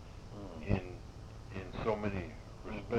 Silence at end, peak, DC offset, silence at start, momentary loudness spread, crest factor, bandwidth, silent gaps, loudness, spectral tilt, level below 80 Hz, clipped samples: 0 s; -18 dBFS; under 0.1%; 0 s; 14 LU; 22 dB; 10.5 kHz; none; -41 LUFS; -7.5 dB/octave; -50 dBFS; under 0.1%